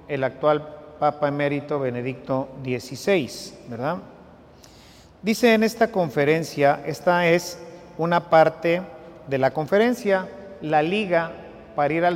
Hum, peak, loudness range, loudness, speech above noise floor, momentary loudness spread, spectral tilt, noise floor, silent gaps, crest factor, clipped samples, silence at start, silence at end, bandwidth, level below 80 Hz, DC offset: none; -4 dBFS; 6 LU; -22 LUFS; 27 dB; 15 LU; -5.5 dB/octave; -49 dBFS; none; 18 dB; under 0.1%; 0.1 s; 0 s; 16.5 kHz; -58 dBFS; under 0.1%